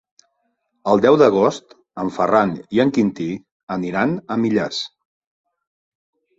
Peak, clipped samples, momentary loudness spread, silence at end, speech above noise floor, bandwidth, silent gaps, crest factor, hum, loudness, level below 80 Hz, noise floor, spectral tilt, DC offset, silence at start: -2 dBFS; under 0.1%; 15 LU; 1.5 s; 53 dB; 7.8 kHz; 3.52-3.67 s; 18 dB; none; -19 LUFS; -58 dBFS; -70 dBFS; -6.5 dB/octave; under 0.1%; 0.85 s